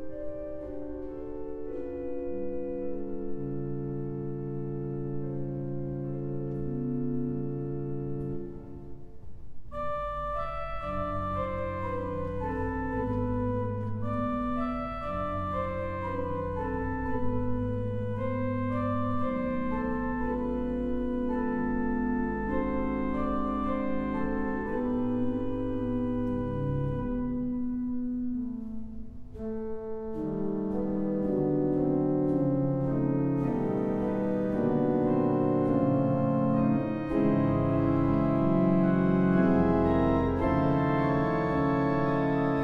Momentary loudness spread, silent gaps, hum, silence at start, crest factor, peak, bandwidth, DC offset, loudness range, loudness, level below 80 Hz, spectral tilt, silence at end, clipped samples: 11 LU; none; none; 0 s; 16 dB; -12 dBFS; 5.6 kHz; under 0.1%; 10 LU; -30 LUFS; -44 dBFS; -10.5 dB/octave; 0 s; under 0.1%